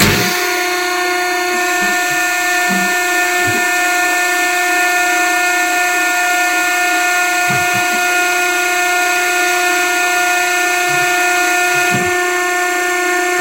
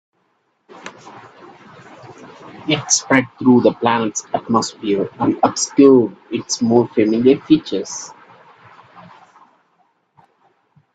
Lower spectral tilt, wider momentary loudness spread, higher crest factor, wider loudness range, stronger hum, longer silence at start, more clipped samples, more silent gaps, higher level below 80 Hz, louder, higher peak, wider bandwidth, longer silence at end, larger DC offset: second, -2 dB/octave vs -4 dB/octave; second, 2 LU vs 18 LU; about the same, 14 dB vs 18 dB; second, 1 LU vs 7 LU; neither; second, 0 s vs 0.85 s; neither; neither; first, -46 dBFS vs -60 dBFS; first, -13 LUFS vs -16 LUFS; about the same, 0 dBFS vs 0 dBFS; first, 16.5 kHz vs 9.2 kHz; second, 0 s vs 2.85 s; first, 0.2% vs under 0.1%